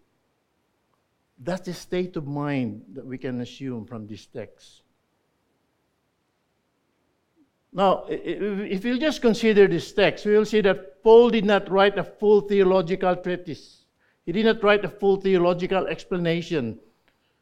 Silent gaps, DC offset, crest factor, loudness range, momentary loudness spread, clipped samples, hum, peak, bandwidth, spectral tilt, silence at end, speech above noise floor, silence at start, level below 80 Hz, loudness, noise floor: none; under 0.1%; 20 dB; 14 LU; 18 LU; under 0.1%; none; -4 dBFS; 11 kHz; -6.5 dB/octave; 0.65 s; 50 dB; 1.4 s; -52 dBFS; -22 LUFS; -72 dBFS